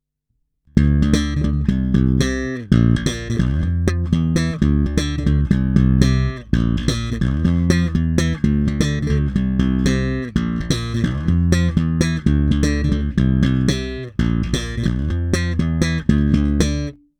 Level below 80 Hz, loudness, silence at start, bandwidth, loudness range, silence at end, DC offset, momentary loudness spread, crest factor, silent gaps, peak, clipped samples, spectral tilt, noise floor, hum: -24 dBFS; -19 LUFS; 0.75 s; 13 kHz; 2 LU; 0.25 s; under 0.1%; 5 LU; 18 dB; none; 0 dBFS; under 0.1%; -6.5 dB/octave; -70 dBFS; none